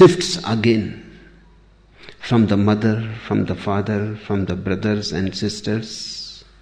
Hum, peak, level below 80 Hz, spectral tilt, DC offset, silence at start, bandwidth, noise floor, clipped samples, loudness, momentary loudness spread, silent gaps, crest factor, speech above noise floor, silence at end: none; -2 dBFS; -48 dBFS; -6 dB/octave; under 0.1%; 0 s; 10 kHz; -50 dBFS; under 0.1%; -20 LUFS; 12 LU; none; 18 dB; 32 dB; 0.2 s